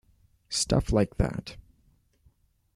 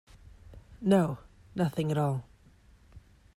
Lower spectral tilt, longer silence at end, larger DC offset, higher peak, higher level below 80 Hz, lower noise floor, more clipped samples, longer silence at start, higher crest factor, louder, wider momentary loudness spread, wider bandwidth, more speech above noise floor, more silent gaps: second, -5 dB/octave vs -7.5 dB/octave; first, 1.15 s vs 0.35 s; neither; first, -10 dBFS vs -14 dBFS; first, -40 dBFS vs -56 dBFS; first, -65 dBFS vs -59 dBFS; neither; about the same, 0.5 s vs 0.5 s; about the same, 20 dB vs 18 dB; about the same, -28 LUFS vs -30 LUFS; about the same, 13 LU vs 14 LU; second, 13 kHz vs 15 kHz; first, 39 dB vs 31 dB; neither